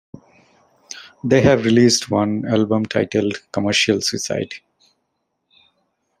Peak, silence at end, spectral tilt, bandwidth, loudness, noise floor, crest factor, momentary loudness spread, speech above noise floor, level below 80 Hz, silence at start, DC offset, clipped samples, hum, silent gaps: -2 dBFS; 1.6 s; -4.5 dB/octave; 15 kHz; -18 LUFS; -73 dBFS; 18 dB; 17 LU; 56 dB; -56 dBFS; 0.15 s; under 0.1%; under 0.1%; none; none